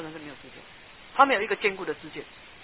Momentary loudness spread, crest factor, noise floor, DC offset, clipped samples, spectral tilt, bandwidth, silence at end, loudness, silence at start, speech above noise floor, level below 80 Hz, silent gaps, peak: 25 LU; 26 dB; -49 dBFS; 0.1%; under 0.1%; -1 dB/octave; 4 kHz; 0 s; -25 LUFS; 0 s; 24 dB; -62 dBFS; none; -4 dBFS